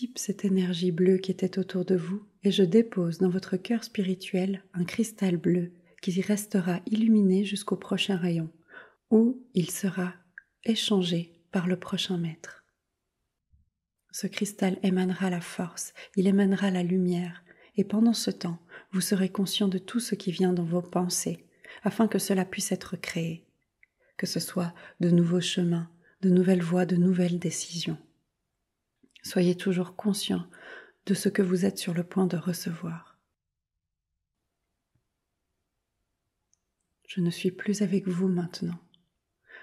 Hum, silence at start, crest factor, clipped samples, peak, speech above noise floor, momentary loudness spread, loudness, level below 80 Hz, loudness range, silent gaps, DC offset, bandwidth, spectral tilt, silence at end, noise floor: none; 0 s; 18 dB; under 0.1%; -10 dBFS; 58 dB; 12 LU; -28 LUFS; -74 dBFS; 6 LU; none; under 0.1%; 14 kHz; -5.5 dB/octave; 0.05 s; -85 dBFS